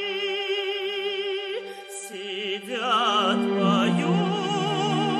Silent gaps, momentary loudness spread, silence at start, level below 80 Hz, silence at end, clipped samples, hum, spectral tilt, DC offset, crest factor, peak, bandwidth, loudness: none; 12 LU; 0 s; -78 dBFS; 0 s; under 0.1%; 50 Hz at -50 dBFS; -5 dB/octave; under 0.1%; 16 dB; -10 dBFS; 13.5 kHz; -25 LUFS